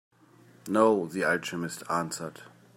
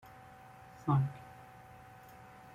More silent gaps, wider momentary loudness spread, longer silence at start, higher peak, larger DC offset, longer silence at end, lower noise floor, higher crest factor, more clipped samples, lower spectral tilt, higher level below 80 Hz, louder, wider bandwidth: neither; second, 14 LU vs 22 LU; second, 0.65 s vs 0.85 s; first, -10 dBFS vs -20 dBFS; neither; second, 0.3 s vs 1.1 s; about the same, -57 dBFS vs -55 dBFS; about the same, 20 dB vs 20 dB; neither; second, -4.5 dB/octave vs -8.5 dB/octave; second, -76 dBFS vs -66 dBFS; first, -28 LUFS vs -34 LUFS; first, 16 kHz vs 14.5 kHz